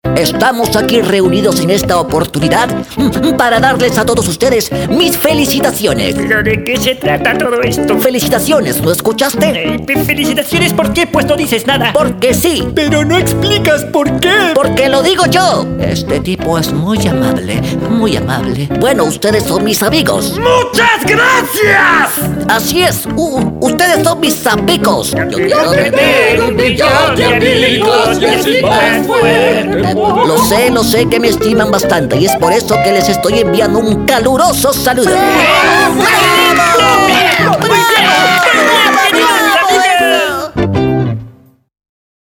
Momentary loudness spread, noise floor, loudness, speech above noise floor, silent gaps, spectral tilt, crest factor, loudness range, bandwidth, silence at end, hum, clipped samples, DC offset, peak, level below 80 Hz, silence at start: 6 LU; -39 dBFS; -10 LUFS; 29 dB; none; -4 dB/octave; 10 dB; 4 LU; over 20 kHz; 0.95 s; none; under 0.1%; under 0.1%; 0 dBFS; -34 dBFS; 0.05 s